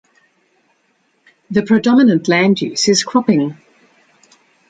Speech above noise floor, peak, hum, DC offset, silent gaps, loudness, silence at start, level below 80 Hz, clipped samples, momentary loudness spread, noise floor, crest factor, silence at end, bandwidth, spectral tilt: 48 dB; 0 dBFS; none; under 0.1%; none; -14 LUFS; 1.5 s; -58 dBFS; under 0.1%; 8 LU; -61 dBFS; 16 dB; 1.15 s; 9.4 kHz; -4.5 dB/octave